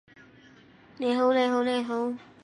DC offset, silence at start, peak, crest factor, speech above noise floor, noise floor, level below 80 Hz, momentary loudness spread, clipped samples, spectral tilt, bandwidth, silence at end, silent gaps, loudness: under 0.1%; 1 s; -12 dBFS; 16 dB; 29 dB; -55 dBFS; -74 dBFS; 9 LU; under 0.1%; -4.5 dB/octave; 10.5 kHz; 0.2 s; none; -26 LUFS